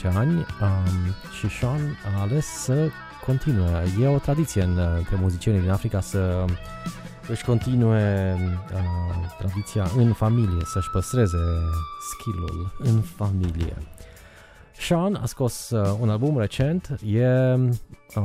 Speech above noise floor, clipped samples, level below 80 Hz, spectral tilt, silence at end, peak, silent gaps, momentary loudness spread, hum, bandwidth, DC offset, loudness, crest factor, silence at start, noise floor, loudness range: 25 dB; under 0.1%; -38 dBFS; -7 dB/octave; 0 s; -6 dBFS; none; 9 LU; none; 15.5 kHz; under 0.1%; -24 LUFS; 16 dB; 0 s; -48 dBFS; 3 LU